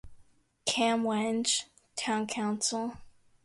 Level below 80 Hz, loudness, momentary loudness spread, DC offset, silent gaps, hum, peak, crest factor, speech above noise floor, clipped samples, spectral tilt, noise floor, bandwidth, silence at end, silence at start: -64 dBFS; -30 LUFS; 9 LU; under 0.1%; none; none; -14 dBFS; 18 dB; 31 dB; under 0.1%; -2.5 dB/octave; -61 dBFS; 11.5 kHz; 0.35 s; 0.05 s